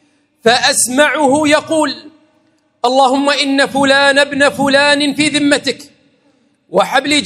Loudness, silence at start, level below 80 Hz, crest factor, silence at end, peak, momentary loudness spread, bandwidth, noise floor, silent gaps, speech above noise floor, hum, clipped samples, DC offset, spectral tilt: -12 LUFS; 0.45 s; -58 dBFS; 14 dB; 0 s; 0 dBFS; 7 LU; 14.5 kHz; -56 dBFS; none; 45 dB; none; 0.1%; under 0.1%; -2 dB/octave